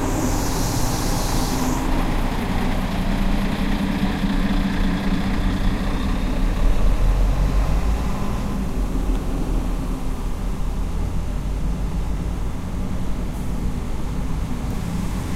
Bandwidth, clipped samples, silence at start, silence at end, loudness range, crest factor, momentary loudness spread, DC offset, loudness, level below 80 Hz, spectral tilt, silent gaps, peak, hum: 15.5 kHz; under 0.1%; 0 s; 0 s; 5 LU; 14 dB; 6 LU; under 0.1%; -24 LUFS; -22 dBFS; -5.5 dB/octave; none; -6 dBFS; none